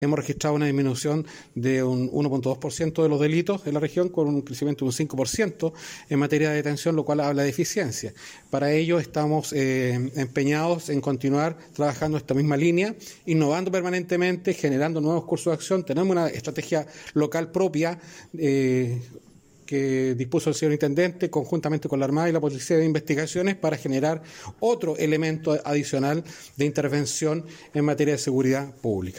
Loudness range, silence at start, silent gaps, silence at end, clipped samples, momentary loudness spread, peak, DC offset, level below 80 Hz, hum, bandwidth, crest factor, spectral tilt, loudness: 2 LU; 0 s; none; 0 s; under 0.1%; 6 LU; -10 dBFS; under 0.1%; -60 dBFS; none; 16.5 kHz; 14 dB; -6 dB/octave; -25 LUFS